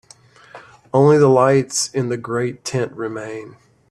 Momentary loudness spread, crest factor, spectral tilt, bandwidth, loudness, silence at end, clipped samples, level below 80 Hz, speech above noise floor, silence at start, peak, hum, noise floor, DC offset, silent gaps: 16 LU; 16 dB; -5.5 dB/octave; 13 kHz; -17 LUFS; 0.4 s; under 0.1%; -58 dBFS; 31 dB; 0.55 s; -2 dBFS; none; -48 dBFS; under 0.1%; none